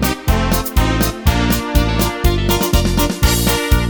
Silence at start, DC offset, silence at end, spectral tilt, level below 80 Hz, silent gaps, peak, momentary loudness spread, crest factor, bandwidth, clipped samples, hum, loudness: 0 s; under 0.1%; 0 s; -4.5 dB/octave; -18 dBFS; none; 0 dBFS; 2 LU; 14 dB; over 20 kHz; under 0.1%; none; -16 LUFS